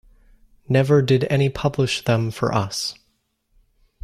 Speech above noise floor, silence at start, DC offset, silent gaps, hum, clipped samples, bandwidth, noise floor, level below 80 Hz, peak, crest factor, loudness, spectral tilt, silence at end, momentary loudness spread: 49 dB; 0.7 s; under 0.1%; none; none; under 0.1%; 13.5 kHz; -68 dBFS; -50 dBFS; -6 dBFS; 16 dB; -20 LUFS; -6 dB/octave; 1.1 s; 7 LU